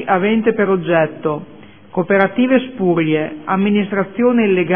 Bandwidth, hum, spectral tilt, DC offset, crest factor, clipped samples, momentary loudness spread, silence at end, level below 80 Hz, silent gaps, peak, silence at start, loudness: 3.6 kHz; none; -10.5 dB/octave; 0.6%; 16 dB; under 0.1%; 8 LU; 0 s; -56 dBFS; none; 0 dBFS; 0 s; -16 LUFS